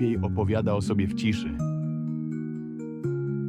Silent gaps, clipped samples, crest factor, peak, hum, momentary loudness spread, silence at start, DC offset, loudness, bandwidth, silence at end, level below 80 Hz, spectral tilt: none; under 0.1%; 14 dB; -12 dBFS; none; 8 LU; 0 s; under 0.1%; -28 LUFS; 11.5 kHz; 0 s; -50 dBFS; -7.5 dB/octave